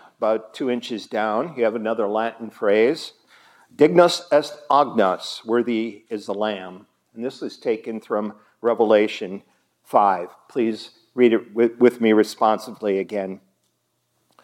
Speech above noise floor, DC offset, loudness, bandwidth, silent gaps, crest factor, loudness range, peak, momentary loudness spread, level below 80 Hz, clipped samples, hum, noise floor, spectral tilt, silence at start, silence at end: 50 dB; under 0.1%; -21 LUFS; 14 kHz; none; 20 dB; 5 LU; -2 dBFS; 14 LU; -80 dBFS; under 0.1%; none; -71 dBFS; -5.5 dB/octave; 0.2 s; 1.05 s